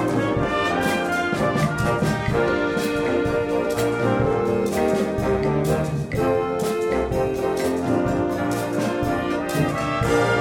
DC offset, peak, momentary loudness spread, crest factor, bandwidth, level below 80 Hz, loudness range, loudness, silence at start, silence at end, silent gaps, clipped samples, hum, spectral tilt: under 0.1%; -8 dBFS; 2 LU; 12 dB; 18 kHz; -40 dBFS; 1 LU; -22 LUFS; 0 s; 0 s; none; under 0.1%; none; -6 dB/octave